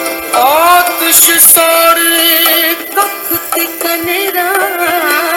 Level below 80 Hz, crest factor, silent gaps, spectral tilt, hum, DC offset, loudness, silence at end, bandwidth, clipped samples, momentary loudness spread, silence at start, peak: -50 dBFS; 10 dB; none; 0.5 dB/octave; none; under 0.1%; -8 LUFS; 0 s; over 20 kHz; 1%; 10 LU; 0 s; 0 dBFS